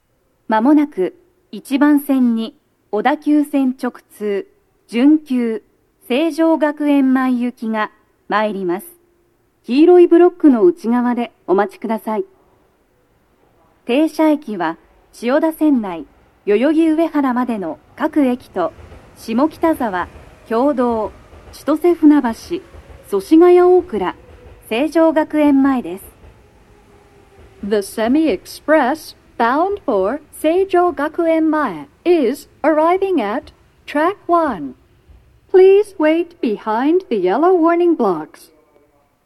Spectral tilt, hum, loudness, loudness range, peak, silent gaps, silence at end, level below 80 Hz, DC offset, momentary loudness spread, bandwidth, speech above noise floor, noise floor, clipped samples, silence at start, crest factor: -6 dB/octave; none; -16 LUFS; 6 LU; 0 dBFS; none; 1 s; -52 dBFS; under 0.1%; 13 LU; 13 kHz; 44 dB; -59 dBFS; under 0.1%; 0.5 s; 16 dB